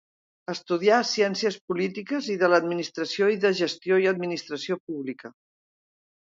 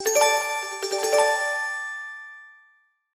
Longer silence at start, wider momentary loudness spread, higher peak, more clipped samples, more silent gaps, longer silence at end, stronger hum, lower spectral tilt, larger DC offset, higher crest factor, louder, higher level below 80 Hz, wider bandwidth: first, 0.5 s vs 0 s; second, 12 LU vs 16 LU; about the same, -6 dBFS vs -8 dBFS; neither; first, 1.61-1.68 s, 4.80-4.87 s vs none; first, 1.05 s vs 0.65 s; neither; first, -4.5 dB/octave vs 1.5 dB/octave; neither; about the same, 20 dB vs 18 dB; about the same, -25 LUFS vs -23 LUFS; about the same, -76 dBFS vs -78 dBFS; second, 7.8 kHz vs 16 kHz